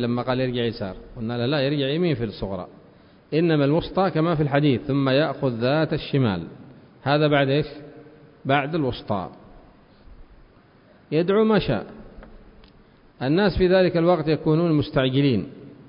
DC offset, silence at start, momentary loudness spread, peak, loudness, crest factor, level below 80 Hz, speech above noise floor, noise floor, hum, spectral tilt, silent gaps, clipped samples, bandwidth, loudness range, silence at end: under 0.1%; 0 s; 13 LU; -4 dBFS; -22 LUFS; 18 dB; -46 dBFS; 32 dB; -53 dBFS; none; -11.5 dB/octave; none; under 0.1%; 5.4 kHz; 5 LU; 0.05 s